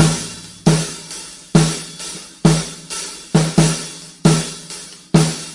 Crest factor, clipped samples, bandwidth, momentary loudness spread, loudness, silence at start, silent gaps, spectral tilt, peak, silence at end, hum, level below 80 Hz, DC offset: 18 dB; under 0.1%; 11.5 kHz; 14 LU; -18 LUFS; 0 s; none; -5 dB/octave; 0 dBFS; 0 s; none; -40 dBFS; under 0.1%